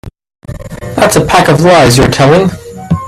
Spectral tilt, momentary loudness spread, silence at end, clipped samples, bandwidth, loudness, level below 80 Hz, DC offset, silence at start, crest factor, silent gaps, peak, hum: -5 dB/octave; 20 LU; 0 s; 0.2%; 16 kHz; -7 LUFS; -30 dBFS; under 0.1%; 0.05 s; 8 dB; none; 0 dBFS; none